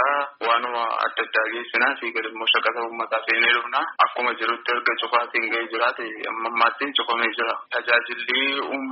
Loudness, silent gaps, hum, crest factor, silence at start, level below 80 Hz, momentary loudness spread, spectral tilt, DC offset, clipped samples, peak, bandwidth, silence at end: -22 LUFS; none; none; 20 dB; 0 s; -80 dBFS; 6 LU; 3 dB/octave; under 0.1%; under 0.1%; -4 dBFS; 5.8 kHz; 0 s